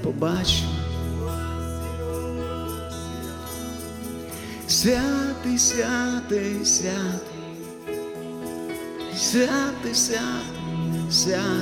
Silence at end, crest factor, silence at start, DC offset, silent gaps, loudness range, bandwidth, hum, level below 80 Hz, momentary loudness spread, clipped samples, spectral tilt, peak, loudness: 0 s; 18 dB; 0 s; under 0.1%; none; 8 LU; 17.5 kHz; none; -40 dBFS; 14 LU; under 0.1%; -3.5 dB/octave; -8 dBFS; -25 LUFS